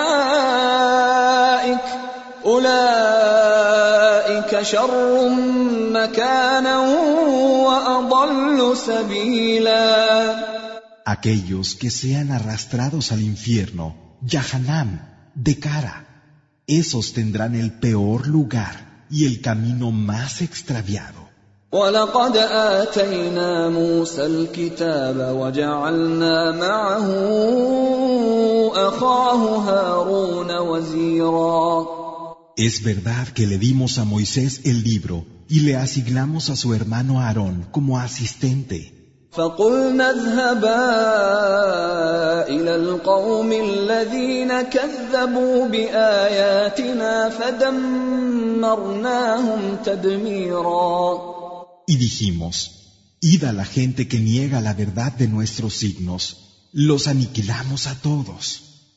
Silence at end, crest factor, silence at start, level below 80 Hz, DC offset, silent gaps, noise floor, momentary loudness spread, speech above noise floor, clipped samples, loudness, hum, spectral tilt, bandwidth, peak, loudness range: 0.35 s; 16 dB; 0 s; -50 dBFS; under 0.1%; none; -54 dBFS; 9 LU; 35 dB; under 0.1%; -19 LUFS; none; -5.5 dB/octave; 8 kHz; -2 dBFS; 6 LU